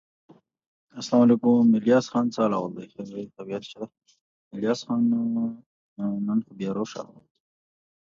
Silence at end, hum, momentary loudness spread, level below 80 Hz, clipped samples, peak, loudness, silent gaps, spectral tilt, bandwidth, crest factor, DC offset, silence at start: 1.15 s; none; 21 LU; -72 dBFS; under 0.1%; -8 dBFS; -24 LUFS; 4.21-4.51 s, 5.66-5.96 s; -6.5 dB/octave; 7.4 kHz; 18 dB; under 0.1%; 0.95 s